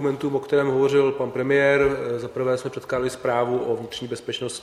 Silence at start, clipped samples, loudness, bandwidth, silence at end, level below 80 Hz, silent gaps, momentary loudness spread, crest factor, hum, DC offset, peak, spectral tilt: 0 s; under 0.1%; -23 LUFS; 12.5 kHz; 0 s; -54 dBFS; none; 10 LU; 16 dB; none; under 0.1%; -6 dBFS; -5.5 dB/octave